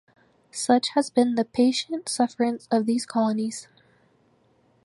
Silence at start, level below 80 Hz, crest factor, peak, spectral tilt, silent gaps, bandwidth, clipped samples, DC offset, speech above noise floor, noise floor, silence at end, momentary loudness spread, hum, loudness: 0.55 s; -72 dBFS; 18 dB; -6 dBFS; -4 dB/octave; none; 11.5 kHz; under 0.1%; under 0.1%; 39 dB; -63 dBFS; 1.2 s; 8 LU; none; -24 LUFS